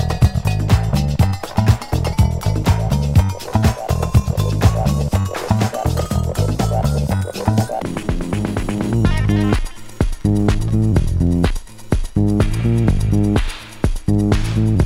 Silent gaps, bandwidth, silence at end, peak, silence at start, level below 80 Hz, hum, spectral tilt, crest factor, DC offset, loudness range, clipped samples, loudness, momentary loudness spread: none; 16 kHz; 0 s; 0 dBFS; 0 s; -24 dBFS; none; -7 dB/octave; 16 dB; under 0.1%; 2 LU; under 0.1%; -18 LUFS; 6 LU